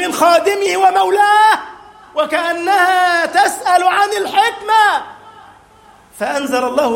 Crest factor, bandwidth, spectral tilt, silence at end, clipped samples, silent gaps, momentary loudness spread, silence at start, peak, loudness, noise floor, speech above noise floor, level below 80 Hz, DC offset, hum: 14 dB; 16.5 kHz; -1.5 dB/octave; 0 s; under 0.1%; none; 9 LU; 0 s; 0 dBFS; -13 LUFS; -45 dBFS; 32 dB; -58 dBFS; under 0.1%; none